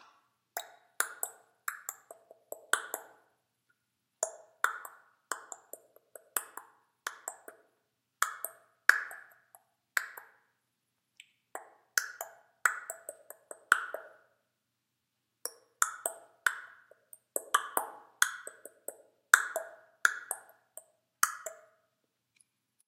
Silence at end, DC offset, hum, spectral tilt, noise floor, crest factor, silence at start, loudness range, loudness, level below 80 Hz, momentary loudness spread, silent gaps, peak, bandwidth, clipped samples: 1.3 s; under 0.1%; none; 3 dB/octave; -83 dBFS; 38 dB; 0.55 s; 8 LU; -34 LUFS; under -90 dBFS; 20 LU; none; 0 dBFS; 16 kHz; under 0.1%